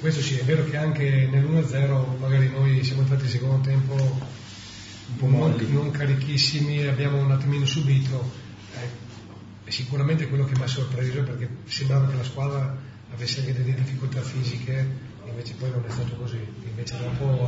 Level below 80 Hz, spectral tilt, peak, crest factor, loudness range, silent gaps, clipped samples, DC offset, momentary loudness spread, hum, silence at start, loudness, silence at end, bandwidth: -54 dBFS; -6.5 dB/octave; -10 dBFS; 14 dB; 6 LU; none; under 0.1%; under 0.1%; 15 LU; none; 0 s; -24 LUFS; 0 s; 7.8 kHz